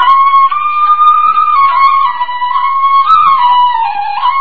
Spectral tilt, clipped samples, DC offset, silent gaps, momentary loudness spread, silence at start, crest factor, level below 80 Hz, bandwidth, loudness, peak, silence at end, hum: -2 dB/octave; 0.2%; 5%; none; 7 LU; 0 s; 8 dB; -52 dBFS; 4.8 kHz; -8 LUFS; 0 dBFS; 0 s; none